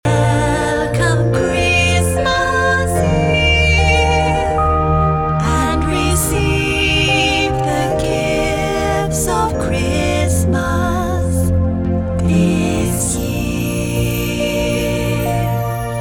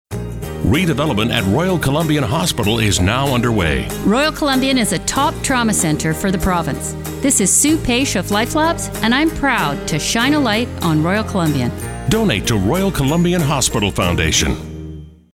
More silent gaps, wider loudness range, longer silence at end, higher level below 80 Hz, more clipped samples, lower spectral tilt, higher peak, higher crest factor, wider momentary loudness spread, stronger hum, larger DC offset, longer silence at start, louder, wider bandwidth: neither; about the same, 3 LU vs 1 LU; second, 0 s vs 0.25 s; first, -24 dBFS vs -32 dBFS; neither; about the same, -5 dB/octave vs -4 dB/octave; about the same, -2 dBFS vs -2 dBFS; about the same, 14 dB vs 14 dB; about the same, 5 LU vs 6 LU; neither; neither; about the same, 0.05 s vs 0.1 s; about the same, -15 LUFS vs -16 LUFS; first, 19 kHz vs 17 kHz